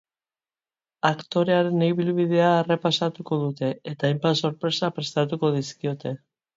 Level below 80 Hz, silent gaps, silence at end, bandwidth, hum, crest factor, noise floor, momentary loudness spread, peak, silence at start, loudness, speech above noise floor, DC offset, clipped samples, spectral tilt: -68 dBFS; none; 0.4 s; 7.8 kHz; none; 20 dB; under -90 dBFS; 9 LU; -4 dBFS; 1.05 s; -24 LUFS; over 67 dB; under 0.1%; under 0.1%; -6 dB/octave